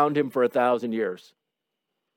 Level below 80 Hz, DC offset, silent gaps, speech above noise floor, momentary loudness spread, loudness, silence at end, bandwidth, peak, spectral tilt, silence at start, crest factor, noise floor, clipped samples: -84 dBFS; under 0.1%; none; 59 dB; 9 LU; -25 LUFS; 1 s; 16.5 kHz; -8 dBFS; -7 dB/octave; 0 s; 18 dB; -83 dBFS; under 0.1%